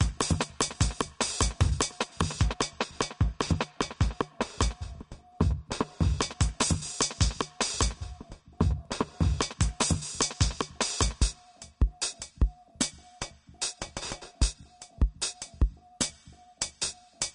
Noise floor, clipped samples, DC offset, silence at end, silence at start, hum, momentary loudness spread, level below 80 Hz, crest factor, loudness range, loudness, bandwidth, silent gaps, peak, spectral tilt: -54 dBFS; under 0.1%; under 0.1%; 0.05 s; 0 s; none; 10 LU; -34 dBFS; 20 dB; 4 LU; -30 LUFS; 11.5 kHz; none; -10 dBFS; -3.5 dB/octave